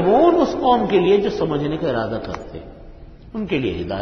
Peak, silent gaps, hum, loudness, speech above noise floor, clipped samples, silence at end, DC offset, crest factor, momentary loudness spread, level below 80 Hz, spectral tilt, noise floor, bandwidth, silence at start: -4 dBFS; none; none; -19 LUFS; 19 dB; under 0.1%; 0 s; under 0.1%; 16 dB; 17 LU; -42 dBFS; -7.5 dB/octave; -39 dBFS; 6.4 kHz; 0 s